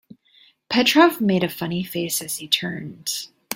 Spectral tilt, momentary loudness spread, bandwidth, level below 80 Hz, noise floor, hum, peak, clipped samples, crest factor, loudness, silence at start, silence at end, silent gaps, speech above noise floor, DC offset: -3.5 dB/octave; 13 LU; 17 kHz; -64 dBFS; -56 dBFS; none; -2 dBFS; under 0.1%; 20 dB; -21 LUFS; 0.7 s; 0 s; none; 35 dB; under 0.1%